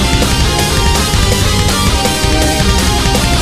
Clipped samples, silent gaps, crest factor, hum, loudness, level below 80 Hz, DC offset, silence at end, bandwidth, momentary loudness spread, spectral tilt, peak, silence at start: under 0.1%; none; 10 dB; none; -11 LUFS; -16 dBFS; under 0.1%; 0 s; 15.5 kHz; 0 LU; -3.5 dB/octave; 0 dBFS; 0 s